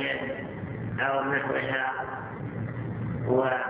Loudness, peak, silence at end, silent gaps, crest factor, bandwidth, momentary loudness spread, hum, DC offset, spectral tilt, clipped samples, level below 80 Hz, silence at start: -30 LUFS; -12 dBFS; 0 s; none; 18 dB; 4 kHz; 10 LU; none; under 0.1%; -4.5 dB/octave; under 0.1%; -54 dBFS; 0 s